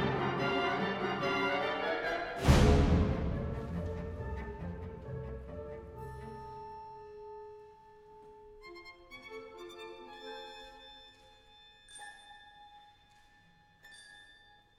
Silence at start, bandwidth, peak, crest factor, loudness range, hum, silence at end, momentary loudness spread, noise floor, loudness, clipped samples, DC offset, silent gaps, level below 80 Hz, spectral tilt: 0 s; 14 kHz; -12 dBFS; 24 dB; 23 LU; none; 0.45 s; 24 LU; -64 dBFS; -34 LUFS; under 0.1%; under 0.1%; none; -42 dBFS; -6 dB/octave